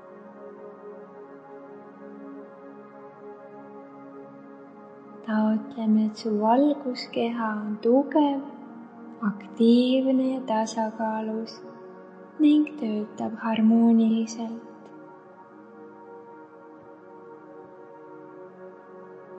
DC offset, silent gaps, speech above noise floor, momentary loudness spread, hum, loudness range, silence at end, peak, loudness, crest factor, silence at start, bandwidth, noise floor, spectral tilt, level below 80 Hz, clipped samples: under 0.1%; none; 25 dB; 25 LU; none; 21 LU; 0 s; -8 dBFS; -24 LUFS; 18 dB; 0 s; 8.2 kHz; -48 dBFS; -6.5 dB/octave; -84 dBFS; under 0.1%